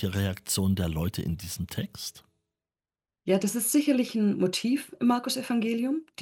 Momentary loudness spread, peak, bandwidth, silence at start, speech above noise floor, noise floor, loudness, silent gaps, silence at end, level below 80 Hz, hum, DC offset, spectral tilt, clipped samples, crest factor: 10 LU; -12 dBFS; 17.5 kHz; 0 s; over 63 dB; under -90 dBFS; -28 LUFS; none; 0 s; -52 dBFS; none; under 0.1%; -5 dB/octave; under 0.1%; 16 dB